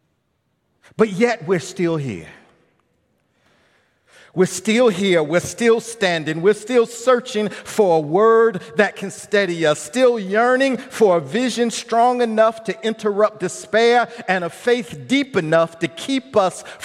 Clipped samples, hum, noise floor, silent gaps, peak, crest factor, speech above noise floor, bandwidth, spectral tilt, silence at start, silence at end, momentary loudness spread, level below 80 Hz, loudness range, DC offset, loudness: under 0.1%; none; -68 dBFS; none; 0 dBFS; 18 dB; 51 dB; 14.5 kHz; -4.5 dB/octave; 1 s; 0 s; 7 LU; -66 dBFS; 6 LU; under 0.1%; -18 LUFS